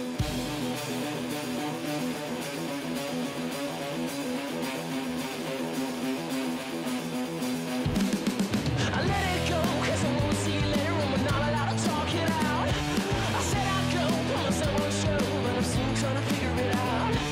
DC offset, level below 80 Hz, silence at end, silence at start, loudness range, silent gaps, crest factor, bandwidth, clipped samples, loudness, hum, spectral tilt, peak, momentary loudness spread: under 0.1%; -44 dBFS; 0 s; 0 s; 5 LU; none; 10 dB; 16 kHz; under 0.1%; -29 LUFS; none; -5 dB/octave; -18 dBFS; 6 LU